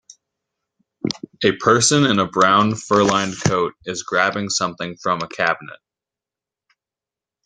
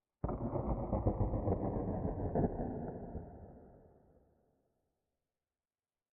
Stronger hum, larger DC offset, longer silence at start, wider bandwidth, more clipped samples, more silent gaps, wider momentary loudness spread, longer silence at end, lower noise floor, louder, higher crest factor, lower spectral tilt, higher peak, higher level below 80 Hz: neither; neither; first, 1.05 s vs 0.25 s; first, 10 kHz vs 2.6 kHz; neither; neither; second, 12 LU vs 15 LU; second, 1.75 s vs 2.3 s; about the same, -89 dBFS vs under -90 dBFS; first, -18 LUFS vs -38 LUFS; about the same, 20 dB vs 20 dB; second, -3.5 dB/octave vs -9 dB/octave; first, 0 dBFS vs -20 dBFS; second, -56 dBFS vs -48 dBFS